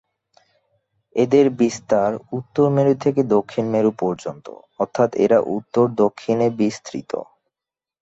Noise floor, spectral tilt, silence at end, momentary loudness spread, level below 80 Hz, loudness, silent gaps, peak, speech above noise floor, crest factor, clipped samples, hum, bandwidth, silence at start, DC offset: -89 dBFS; -7 dB/octave; 0.8 s; 13 LU; -62 dBFS; -20 LUFS; none; -4 dBFS; 70 dB; 18 dB; under 0.1%; none; 8 kHz; 1.15 s; under 0.1%